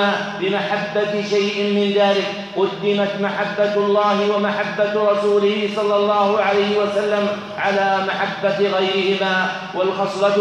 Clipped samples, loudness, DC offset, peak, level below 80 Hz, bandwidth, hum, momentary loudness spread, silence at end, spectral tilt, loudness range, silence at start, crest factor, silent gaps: under 0.1%; -19 LUFS; under 0.1%; -4 dBFS; -66 dBFS; 9.6 kHz; none; 5 LU; 0 s; -5 dB/octave; 2 LU; 0 s; 14 dB; none